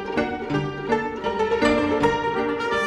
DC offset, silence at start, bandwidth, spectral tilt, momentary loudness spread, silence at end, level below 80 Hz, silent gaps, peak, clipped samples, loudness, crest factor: under 0.1%; 0 s; 11 kHz; -5.5 dB/octave; 6 LU; 0 s; -46 dBFS; none; -6 dBFS; under 0.1%; -23 LUFS; 16 dB